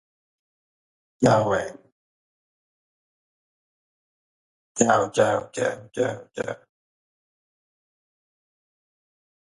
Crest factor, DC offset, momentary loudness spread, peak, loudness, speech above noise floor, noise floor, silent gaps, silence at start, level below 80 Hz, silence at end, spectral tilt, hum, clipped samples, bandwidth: 26 dB; under 0.1%; 13 LU; -4 dBFS; -23 LUFS; over 68 dB; under -90 dBFS; 1.92-4.75 s; 1.2 s; -62 dBFS; 3 s; -5 dB/octave; none; under 0.1%; 11.5 kHz